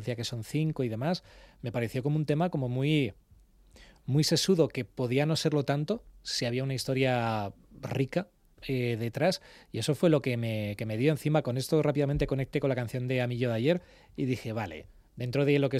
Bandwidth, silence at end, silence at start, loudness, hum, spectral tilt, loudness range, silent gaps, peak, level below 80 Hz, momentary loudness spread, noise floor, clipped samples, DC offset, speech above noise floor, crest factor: 15 kHz; 0 s; 0 s; -30 LUFS; none; -6 dB/octave; 3 LU; none; -10 dBFS; -54 dBFS; 10 LU; -59 dBFS; under 0.1%; under 0.1%; 30 dB; 18 dB